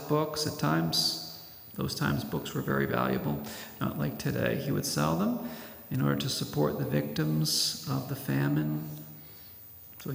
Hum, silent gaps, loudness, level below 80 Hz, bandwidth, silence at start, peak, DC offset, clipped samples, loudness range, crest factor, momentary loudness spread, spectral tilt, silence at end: none; none; -30 LUFS; -60 dBFS; 16.5 kHz; 0 s; -14 dBFS; under 0.1%; under 0.1%; 2 LU; 18 dB; 16 LU; -5 dB/octave; 0 s